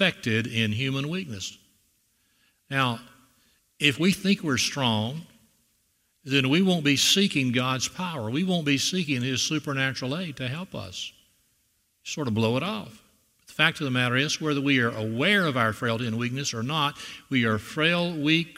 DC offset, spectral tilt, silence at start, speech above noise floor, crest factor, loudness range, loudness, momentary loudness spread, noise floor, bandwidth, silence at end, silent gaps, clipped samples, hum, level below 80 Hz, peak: under 0.1%; -4 dB/octave; 0 s; 44 dB; 22 dB; 7 LU; -25 LUFS; 13 LU; -70 dBFS; 16 kHz; 0.05 s; none; under 0.1%; none; -64 dBFS; -4 dBFS